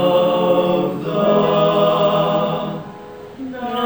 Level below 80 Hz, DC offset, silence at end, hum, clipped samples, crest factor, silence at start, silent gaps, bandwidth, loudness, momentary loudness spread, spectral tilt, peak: -54 dBFS; 0.1%; 0 s; none; under 0.1%; 14 dB; 0 s; none; over 20 kHz; -17 LUFS; 16 LU; -7.5 dB/octave; -4 dBFS